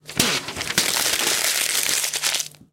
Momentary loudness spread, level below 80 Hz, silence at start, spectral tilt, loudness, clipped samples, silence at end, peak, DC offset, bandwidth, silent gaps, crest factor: 4 LU; -54 dBFS; 0.05 s; 0 dB/octave; -20 LUFS; under 0.1%; 0.25 s; -2 dBFS; under 0.1%; 17.5 kHz; none; 20 dB